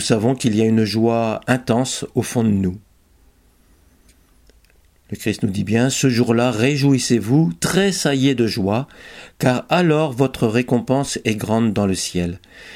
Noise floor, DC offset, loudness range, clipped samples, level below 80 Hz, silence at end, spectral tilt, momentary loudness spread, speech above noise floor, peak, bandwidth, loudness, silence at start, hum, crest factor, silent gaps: -54 dBFS; under 0.1%; 8 LU; under 0.1%; -50 dBFS; 0 s; -5.5 dB/octave; 8 LU; 36 dB; 0 dBFS; 16.5 kHz; -18 LUFS; 0 s; none; 18 dB; none